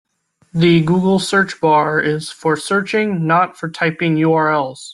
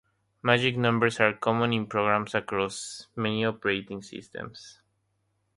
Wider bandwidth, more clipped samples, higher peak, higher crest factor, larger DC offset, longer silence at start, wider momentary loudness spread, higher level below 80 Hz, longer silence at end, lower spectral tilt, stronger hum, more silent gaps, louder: about the same, 12 kHz vs 11.5 kHz; neither; about the same, -2 dBFS vs -4 dBFS; second, 14 dB vs 24 dB; neither; about the same, 0.55 s vs 0.45 s; second, 6 LU vs 16 LU; first, -56 dBFS vs -64 dBFS; second, 0 s vs 0.85 s; about the same, -6 dB/octave vs -5 dB/octave; neither; neither; first, -16 LUFS vs -26 LUFS